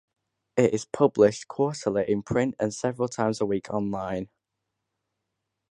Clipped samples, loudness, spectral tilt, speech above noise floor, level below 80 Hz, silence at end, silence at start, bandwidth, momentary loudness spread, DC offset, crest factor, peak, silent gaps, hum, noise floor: under 0.1%; -26 LUFS; -6 dB/octave; 58 dB; -58 dBFS; 1.45 s; 0.55 s; 11 kHz; 9 LU; under 0.1%; 20 dB; -6 dBFS; none; none; -83 dBFS